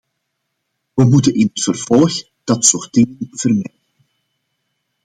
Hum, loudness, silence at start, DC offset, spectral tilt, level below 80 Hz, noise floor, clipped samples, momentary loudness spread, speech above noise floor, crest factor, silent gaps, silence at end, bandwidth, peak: none; -15 LUFS; 0.95 s; under 0.1%; -5 dB/octave; -54 dBFS; -73 dBFS; under 0.1%; 9 LU; 59 dB; 16 dB; none; 1.4 s; 11 kHz; 0 dBFS